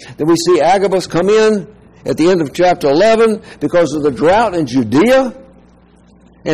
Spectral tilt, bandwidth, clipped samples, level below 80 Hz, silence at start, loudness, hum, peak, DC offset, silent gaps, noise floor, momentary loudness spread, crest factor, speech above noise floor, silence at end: -5.5 dB/octave; 15 kHz; under 0.1%; -44 dBFS; 0 s; -12 LUFS; none; -4 dBFS; 0.7%; none; -45 dBFS; 9 LU; 8 dB; 34 dB; 0 s